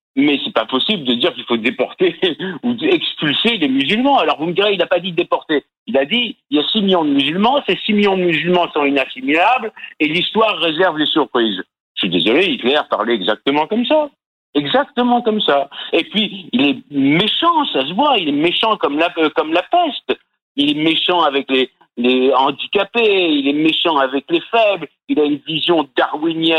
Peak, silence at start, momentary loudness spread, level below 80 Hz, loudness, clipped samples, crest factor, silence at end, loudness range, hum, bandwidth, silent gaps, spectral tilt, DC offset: -2 dBFS; 0.15 s; 5 LU; -62 dBFS; -16 LUFS; under 0.1%; 14 dB; 0 s; 2 LU; none; 9.8 kHz; 5.78-5.86 s, 11.80-11.95 s, 14.26-14.53 s, 20.42-20.55 s; -6 dB/octave; under 0.1%